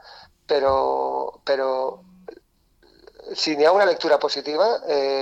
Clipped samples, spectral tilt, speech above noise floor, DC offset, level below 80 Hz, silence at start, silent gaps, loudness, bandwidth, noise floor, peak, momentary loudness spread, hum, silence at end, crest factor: under 0.1%; -3 dB/octave; 39 dB; under 0.1%; -56 dBFS; 0.05 s; none; -21 LUFS; 8.6 kHz; -60 dBFS; -8 dBFS; 10 LU; none; 0 s; 16 dB